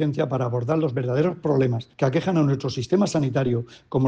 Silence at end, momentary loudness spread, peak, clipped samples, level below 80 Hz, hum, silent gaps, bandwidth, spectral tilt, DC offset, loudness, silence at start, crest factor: 0 s; 4 LU; -8 dBFS; under 0.1%; -56 dBFS; none; none; 9 kHz; -7.5 dB/octave; under 0.1%; -23 LUFS; 0 s; 14 dB